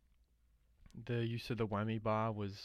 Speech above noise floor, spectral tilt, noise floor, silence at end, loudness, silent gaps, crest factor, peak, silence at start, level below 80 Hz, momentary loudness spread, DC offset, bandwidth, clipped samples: 34 dB; -7.5 dB/octave; -72 dBFS; 0 s; -39 LUFS; none; 16 dB; -24 dBFS; 0.8 s; -64 dBFS; 10 LU; under 0.1%; 13.5 kHz; under 0.1%